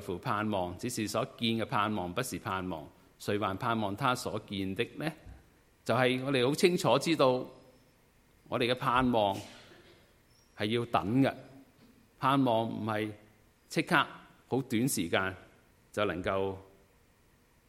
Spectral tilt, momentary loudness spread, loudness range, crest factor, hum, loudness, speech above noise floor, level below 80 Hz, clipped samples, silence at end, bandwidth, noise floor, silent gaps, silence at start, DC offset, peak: -5 dB/octave; 12 LU; 4 LU; 24 dB; none; -31 LUFS; 35 dB; -62 dBFS; under 0.1%; 1.05 s; 16.5 kHz; -65 dBFS; none; 0 s; under 0.1%; -10 dBFS